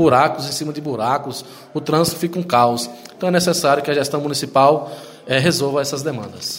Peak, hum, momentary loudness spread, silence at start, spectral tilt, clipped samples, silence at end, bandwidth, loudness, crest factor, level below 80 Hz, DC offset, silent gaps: 0 dBFS; none; 12 LU; 0 s; -4.5 dB/octave; under 0.1%; 0 s; 16.5 kHz; -18 LUFS; 18 dB; -56 dBFS; under 0.1%; none